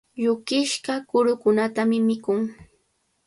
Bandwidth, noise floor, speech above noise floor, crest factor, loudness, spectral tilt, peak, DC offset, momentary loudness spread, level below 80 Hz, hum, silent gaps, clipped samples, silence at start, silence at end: 11.5 kHz; -70 dBFS; 48 dB; 14 dB; -23 LUFS; -4.5 dB/octave; -8 dBFS; under 0.1%; 6 LU; -64 dBFS; none; none; under 0.1%; 0.15 s; 0.75 s